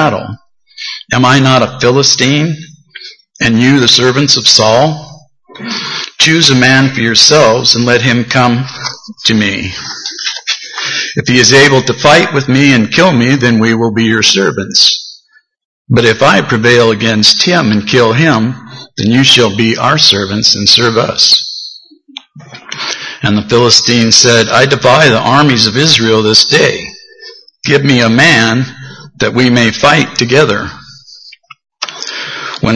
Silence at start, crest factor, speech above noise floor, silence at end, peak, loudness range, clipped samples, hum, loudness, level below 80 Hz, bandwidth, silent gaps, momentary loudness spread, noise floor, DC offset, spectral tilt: 0 s; 10 dB; 40 dB; 0 s; 0 dBFS; 4 LU; 1%; none; -7 LUFS; -44 dBFS; 11 kHz; 15.65-15.85 s; 14 LU; -48 dBFS; under 0.1%; -3.5 dB/octave